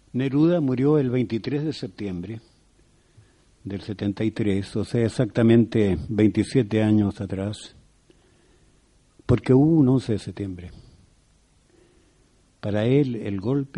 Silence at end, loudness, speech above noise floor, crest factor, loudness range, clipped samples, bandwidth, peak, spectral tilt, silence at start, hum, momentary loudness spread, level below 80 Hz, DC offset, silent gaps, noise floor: 0 s; -23 LUFS; 38 dB; 18 dB; 8 LU; under 0.1%; 11 kHz; -4 dBFS; -8 dB/octave; 0.15 s; none; 16 LU; -50 dBFS; under 0.1%; none; -60 dBFS